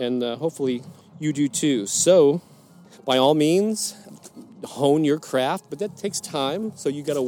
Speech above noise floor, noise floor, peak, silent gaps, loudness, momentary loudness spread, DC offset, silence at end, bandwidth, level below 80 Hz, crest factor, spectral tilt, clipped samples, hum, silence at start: 27 dB; -49 dBFS; -4 dBFS; none; -22 LUFS; 12 LU; under 0.1%; 0 s; 18.5 kHz; -74 dBFS; 18 dB; -4.5 dB/octave; under 0.1%; none; 0 s